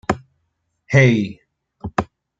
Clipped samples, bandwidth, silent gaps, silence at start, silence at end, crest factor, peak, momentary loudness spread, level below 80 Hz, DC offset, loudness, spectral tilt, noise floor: under 0.1%; 7.8 kHz; none; 0.1 s; 0.35 s; 18 dB; -2 dBFS; 15 LU; -48 dBFS; under 0.1%; -19 LUFS; -7 dB/octave; -71 dBFS